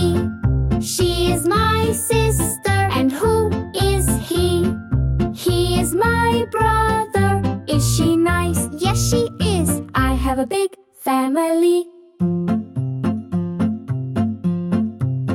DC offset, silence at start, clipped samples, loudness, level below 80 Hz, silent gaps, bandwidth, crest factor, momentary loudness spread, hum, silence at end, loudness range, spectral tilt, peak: under 0.1%; 0 s; under 0.1%; -19 LUFS; -30 dBFS; none; 17 kHz; 12 dB; 6 LU; none; 0 s; 3 LU; -5.5 dB/octave; -6 dBFS